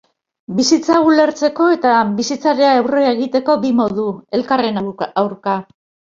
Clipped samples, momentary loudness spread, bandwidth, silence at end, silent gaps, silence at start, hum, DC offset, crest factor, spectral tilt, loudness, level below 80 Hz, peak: under 0.1%; 9 LU; 7.8 kHz; 0.5 s; none; 0.5 s; none; under 0.1%; 14 dB; -4.5 dB/octave; -15 LUFS; -58 dBFS; 0 dBFS